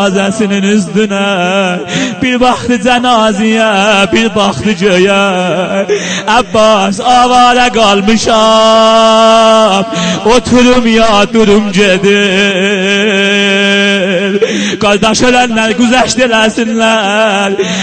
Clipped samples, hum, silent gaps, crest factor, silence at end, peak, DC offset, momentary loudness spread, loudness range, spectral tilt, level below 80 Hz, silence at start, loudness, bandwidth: 0.3%; none; none; 8 dB; 0 s; 0 dBFS; under 0.1%; 6 LU; 3 LU; -4 dB/octave; -36 dBFS; 0 s; -8 LUFS; 9.2 kHz